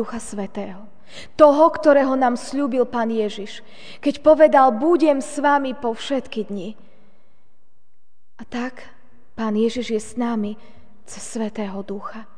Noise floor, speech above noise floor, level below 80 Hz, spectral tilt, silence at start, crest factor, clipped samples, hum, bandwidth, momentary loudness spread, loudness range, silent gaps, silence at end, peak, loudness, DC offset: -68 dBFS; 48 dB; -56 dBFS; -5 dB/octave; 0 s; 20 dB; under 0.1%; none; 10 kHz; 20 LU; 12 LU; none; 0.15 s; 0 dBFS; -19 LUFS; 2%